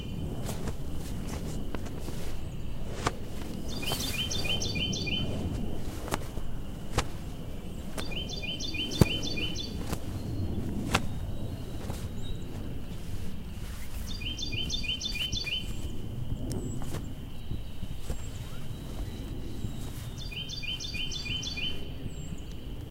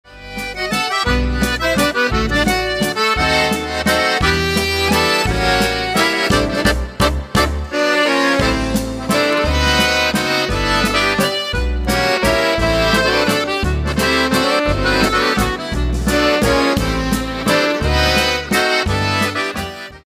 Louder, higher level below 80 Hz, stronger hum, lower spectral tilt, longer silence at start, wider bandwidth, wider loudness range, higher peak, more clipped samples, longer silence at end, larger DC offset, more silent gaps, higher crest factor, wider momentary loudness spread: second, -35 LUFS vs -16 LUFS; second, -38 dBFS vs -26 dBFS; neither; about the same, -4 dB/octave vs -4 dB/octave; about the same, 0 s vs 0.1 s; about the same, 16 kHz vs 16 kHz; first, 7 LU vs 1 LU; about the same, -2 dBFS vs 0 dBFS; neither; about the same, 0 s vs 0.05 s; neither; neither; first, 30 dB vs 16 dB; first, 11 LU vs 5 LU